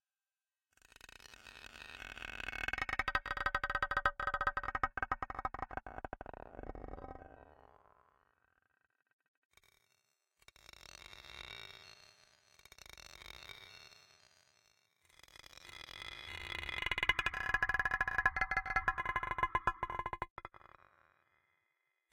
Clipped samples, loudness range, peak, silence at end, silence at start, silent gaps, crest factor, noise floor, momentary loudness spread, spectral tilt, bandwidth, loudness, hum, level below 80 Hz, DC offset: under 0.1%; 20 LU; -14 dBFS; 1.65 s; 1.25 s; 9.13-9.19 s, 9.28-9.50 s, 20.30-20.36 s; 28 dB; under -90 dBFS; 22 LU; -3 dB/octave; 16.5 kHz; -38 LUFS; none; -56 dBFS; under 0.1%